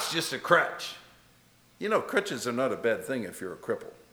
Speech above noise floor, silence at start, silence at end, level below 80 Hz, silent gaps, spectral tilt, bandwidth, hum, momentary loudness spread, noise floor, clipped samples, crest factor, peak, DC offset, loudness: 31 dB; 0 s; 0.15 s; -72 dBFS; none; -3.5 dB/octave; over 20 kHz; none; 14 LU; -61 dBFS; under 0.1%; 24 dB; -6 dBFS; under 0.1%; -29 LUFS